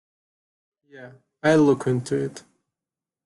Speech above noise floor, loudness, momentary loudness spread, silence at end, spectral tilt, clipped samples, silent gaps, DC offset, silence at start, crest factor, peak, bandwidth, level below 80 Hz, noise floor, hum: 68 dB; -22 LUFS; 10 LU; 0.85 s; -6.5 dB/octave; under 0.1%; none; under 0.1%; 0.95 s; 18 dB; -6 dBFS; 11.5 kHz; -64 dBFS; -89 dBFS; none